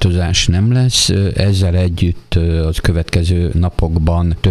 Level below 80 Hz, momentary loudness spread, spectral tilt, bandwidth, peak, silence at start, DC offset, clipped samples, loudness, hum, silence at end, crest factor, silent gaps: -22 dBFS; 4 LU; -5 dB/octave; 12.5 kHz; 0 dBFS; 0 s; under 0.1%; under 0.1%; -14 LUFS; none; 0 s; 14 dB; none